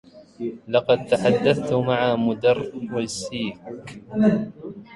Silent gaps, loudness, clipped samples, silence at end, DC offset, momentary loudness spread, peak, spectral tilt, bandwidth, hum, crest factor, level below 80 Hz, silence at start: none; -22 LUFS; under 0.1%; 0 s; under 0.1%; 14 LU; -4 dBFS; -6 dB/octave; 11.5 kHz; none; 18 dB; -56 dBFS; 0.15 s